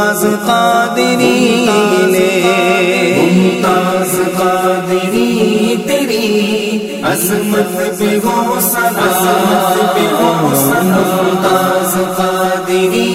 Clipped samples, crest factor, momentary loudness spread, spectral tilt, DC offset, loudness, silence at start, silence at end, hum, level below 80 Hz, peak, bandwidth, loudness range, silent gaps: under 0.1%; 12 dB; 4 LU; -4.5 dB/octave; 0.1%; -12 LUFS; 0 s; 0 s; none; -52 dBFS; 0 dBFS; 16.5 kHz; 3 LU; none